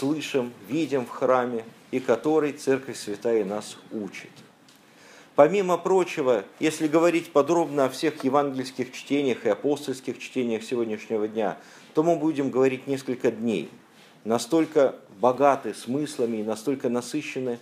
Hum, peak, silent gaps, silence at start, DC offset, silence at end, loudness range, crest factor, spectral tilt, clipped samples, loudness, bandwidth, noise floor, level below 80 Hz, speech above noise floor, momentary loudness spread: none; -4 dBFS; none; 0 s; under 0.1%; 0 s; 4 LU; 22 dB; -5.5 dB/octave; under 0.1%; -25 LUFS; 15.5 kHz; -54 dBFS; -78 dBFS; 30 dB; 11 LU